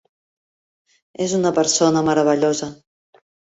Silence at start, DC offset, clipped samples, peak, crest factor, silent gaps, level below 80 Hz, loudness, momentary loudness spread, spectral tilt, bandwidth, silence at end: 1.2 s; under 0.1%; under 0.1%; -4 dBFS; 16 dB; none; -62 dBFS; -18 LUFS; 10 LU; -4 dB/octave; 8.2 kHz; 0.85 s